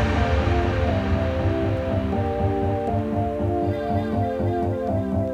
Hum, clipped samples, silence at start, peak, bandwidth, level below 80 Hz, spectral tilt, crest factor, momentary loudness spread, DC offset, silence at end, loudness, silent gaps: none; under 0.1%; 0 s; -10 dBFS; 7.8 kHz; -32 dBFS; -8.5 dB/octave; 12 dB; 3 LU; under 0.1%; 0 s; -23 LUFS; none